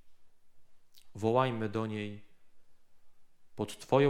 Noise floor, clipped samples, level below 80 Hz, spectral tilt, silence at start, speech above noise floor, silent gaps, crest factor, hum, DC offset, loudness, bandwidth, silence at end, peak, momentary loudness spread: -51 dBFS; under 0.1%; -68 dBFS; -6.5 dB/octave; 0.05 s; 21 dB; none; 22 dB; none; under 0.1%; -34 LUFS; 15.5 kHz; 0 s; -12 dBFS; 23 LU